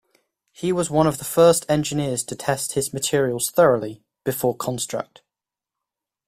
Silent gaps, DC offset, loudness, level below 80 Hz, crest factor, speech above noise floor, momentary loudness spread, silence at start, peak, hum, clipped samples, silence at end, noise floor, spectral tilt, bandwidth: none; under 0.1%; -21 LUFS; -54 dBFS; 20 dB; 67 dB; 12 LU; 0.6 s; -2 dBFS; none; under 0.1%; 1.25 s; -88 dBFS; -4.5 dB/octave; 16 kHz